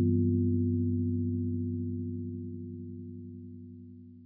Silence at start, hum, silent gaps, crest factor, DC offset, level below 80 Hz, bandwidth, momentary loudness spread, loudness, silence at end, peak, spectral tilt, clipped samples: 0 s; none; none; 16 dB; under 0.1%; under -90 dBFS; 0.4 kHz; 19 LU; -32 LUFS; 0 s; -16 dBFS; -16 dB/octave; under 0.1%